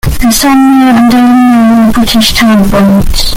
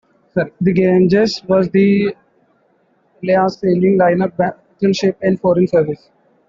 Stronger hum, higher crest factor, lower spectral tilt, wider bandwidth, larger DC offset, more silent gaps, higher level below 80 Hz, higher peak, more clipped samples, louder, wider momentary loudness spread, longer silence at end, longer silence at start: neither; second, 4 dB vs 14 dB; second, -4.5 dB/octave vs -7.5 dB/octave; first, 17 kHz vs 7.4 kHz; neither; neither; first, -18 dBFS vs -52 dBFS; about the same, 0 dBFS vs -2 dBFS; first, 0.2% vs under 0.1%; first, -5 LUFS vs -15 LUFS; second, 3 LU vs 9 LU; second, 0 s vs 0.55 s; second, 0.05 s vs 0.35 s